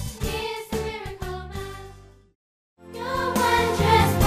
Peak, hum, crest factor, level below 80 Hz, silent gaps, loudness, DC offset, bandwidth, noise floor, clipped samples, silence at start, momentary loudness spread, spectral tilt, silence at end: -4 dBFS; none; 20 dB; -38 dBFS; 2.35-2.76 s; -24 LUFS; under 0.1%; 15.5 kHz; -46 dBFS; under 0.1%; 0 s; 19 LU; -5 dB/octave; 0 s